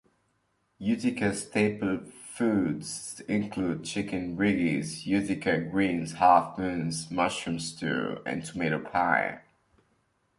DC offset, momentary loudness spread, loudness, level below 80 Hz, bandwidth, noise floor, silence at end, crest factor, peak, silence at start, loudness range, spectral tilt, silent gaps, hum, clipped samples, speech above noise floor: under 0.1%; 9 LU; -28 LUFS; -60 dBFS; 11.5 kHz; -73 dBFS; 1 s; 22 dB; -8 dBFS; 0.8 s; 3 LU; -5 dB/octave; none; none; under 0.1%; 45 dB